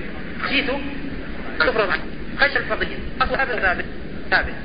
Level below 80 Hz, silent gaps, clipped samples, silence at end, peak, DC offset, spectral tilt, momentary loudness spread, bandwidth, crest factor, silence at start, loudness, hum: -36 dBFS; none; under 0.1%; 0 s; -4 dBFS; 3%; -9.5 dB/octave; 13 LU; 5.2 kHz; 20 dB; 0 s; -22 LUFS; none